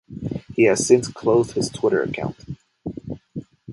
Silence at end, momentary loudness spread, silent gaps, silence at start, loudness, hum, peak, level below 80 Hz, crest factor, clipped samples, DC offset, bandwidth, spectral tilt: 0 s; 19 LU; none; 0.1 s; -20 LUFS; none; -2 dBFS; -50 dBFS; 20 dB; under 0.1%; under 0.1%; 11.5 kHz; -5 dB/octave